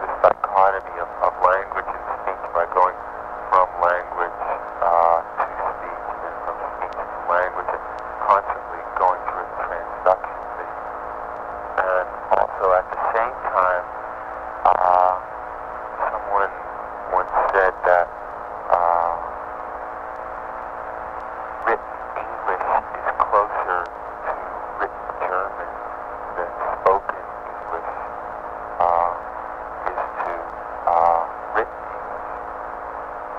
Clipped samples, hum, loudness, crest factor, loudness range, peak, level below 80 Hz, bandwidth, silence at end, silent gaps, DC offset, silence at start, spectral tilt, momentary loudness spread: under 0.1%; none; -23 LUFS; 22 dB; 5 LU; -2 dBFS; -50 dBFS; 7.6 kHz; 0 s; none; under 0.1%; 0 s; -6 dB/octave; 13 LU